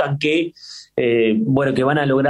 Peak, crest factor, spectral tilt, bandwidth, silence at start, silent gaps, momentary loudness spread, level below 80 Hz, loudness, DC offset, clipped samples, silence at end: -4 dBFS; 14 dB; -7 dB/octave; 11 kHz; 0 s; none; 11 LU; -56 dBFS; -18 LUFS; under 0.1%; under 0.1%; 0 s